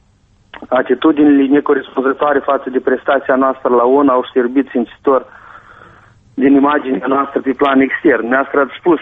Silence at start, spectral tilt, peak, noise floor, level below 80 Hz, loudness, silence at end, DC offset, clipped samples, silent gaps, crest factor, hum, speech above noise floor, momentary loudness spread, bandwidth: 0.55 s; -8 dB/octave; -2 dBFS; -52 dBFS; -54 dBFS; -13 LUFS; 0 s; under 0.1%; under 0.1%; none; 12 dB; none; 39 dB; 6 LU; 3.9 kHz